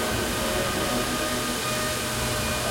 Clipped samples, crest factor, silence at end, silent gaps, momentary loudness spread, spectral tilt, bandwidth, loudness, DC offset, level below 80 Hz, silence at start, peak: under 0.1%; 12 dB; 0 s; none; 1 LU; -3 dB/octave; 16.5 kHz; -25 LUFS; under 0.1%; -40 dBFS; 0 s; -14 dBFS